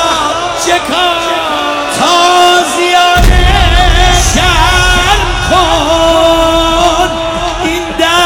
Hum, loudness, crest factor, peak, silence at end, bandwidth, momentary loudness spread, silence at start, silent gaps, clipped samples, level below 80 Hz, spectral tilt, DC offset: none; -8 LUFS; 8 dB; 0 dBFS; 0 s; 18 kHz; 6 LU; 0 s; none; under 0.1%; -16 dBFS; -3.5 dB/octave; under 0.1%